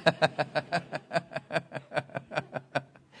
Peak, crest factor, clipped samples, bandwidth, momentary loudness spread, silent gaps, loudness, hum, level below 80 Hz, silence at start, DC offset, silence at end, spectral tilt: -6 dBFS; 26 dB; under 0.1%; 10.5 kHz; 8 LU; none; -33 LUFS; none; -72 dBFS; 0 s; under 0.1%; 0 s; -5 dB/octave